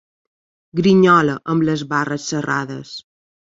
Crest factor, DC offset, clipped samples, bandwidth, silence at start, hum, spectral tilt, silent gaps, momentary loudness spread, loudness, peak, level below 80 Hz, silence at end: 16 dB; under 0.1%; under 0.1%; 7.8 kHz; 0.75 s; none; -6 dB/octave; none; 18 LU; -17 LUFS; -2 dBFS; -56 dBFS; 0.5 s